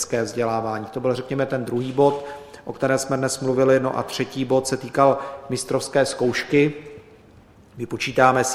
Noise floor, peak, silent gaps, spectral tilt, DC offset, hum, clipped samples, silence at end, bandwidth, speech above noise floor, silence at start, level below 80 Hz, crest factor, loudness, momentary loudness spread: -50 dBFS; 0 dBFS; none; -5 dB/octave; under 0.1%; none; under 0.1%; 0 s; 15 kHz; 28 dB; 0 s; -58 dBFS; 22 dB; -22 LUFS; 12 LU